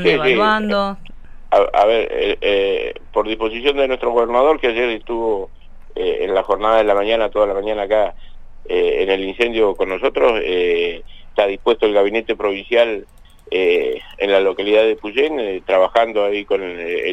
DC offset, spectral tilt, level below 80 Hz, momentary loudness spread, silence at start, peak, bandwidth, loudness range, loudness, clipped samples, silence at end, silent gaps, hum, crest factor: under 0.1%; -5.5 dB/octave; -38 dBFS; 8 LU; 0 s; -2 dBFS; 9 kHz; 1 LU; -17 LUFS; under 0.1%; 0 s; none; none; 14 dB